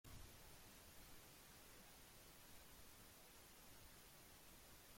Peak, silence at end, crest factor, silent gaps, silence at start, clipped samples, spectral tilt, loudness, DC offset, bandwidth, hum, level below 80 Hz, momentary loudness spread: -48 dBFS; 0 s; 16 dB; none; 0.05 s; under 0.1%; -2.5 dB/octave; -63 LUFS; under 0.1%; 16.5 kHz; none; -72 dBFS; 1 LU